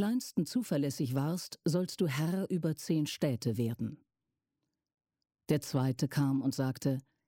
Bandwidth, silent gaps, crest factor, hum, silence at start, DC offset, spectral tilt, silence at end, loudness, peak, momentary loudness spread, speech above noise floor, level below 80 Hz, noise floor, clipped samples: 17 kHz; none; 16 dB; none; 0 s; under 0.1%; -6.5 dB/octave; 0.3 s; -33 LUFS; -18 dBFS; 4 LU; 56 dB; -72 dBFS; -89 dBFS; under 0.1%